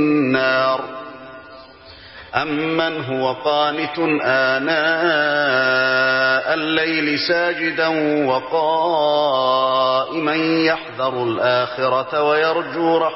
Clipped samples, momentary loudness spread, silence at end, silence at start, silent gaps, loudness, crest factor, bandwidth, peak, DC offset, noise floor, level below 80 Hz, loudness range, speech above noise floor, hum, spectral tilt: under 0.1%; 6 LU; 0 s; 0 s; none; -18 LUFS; 14 dB; 6 kHz; -4 dBFS; under 0.1%; -41 dBFS; -60 dBFS; 5 LU; 24 dB; none; -8 dB/octave